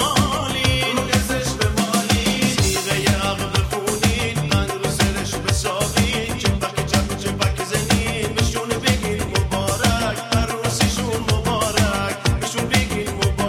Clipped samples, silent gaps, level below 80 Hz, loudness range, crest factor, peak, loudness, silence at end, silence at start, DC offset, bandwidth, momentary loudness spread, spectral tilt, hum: under 0.1%; none; -30 dBFS; 2 LU; 18 dB; -2 dBFS; -20 LUFS; 0 s; 0 s; under 0.1%; 16.5 kHz; 3 LU; -4 dB/octave; none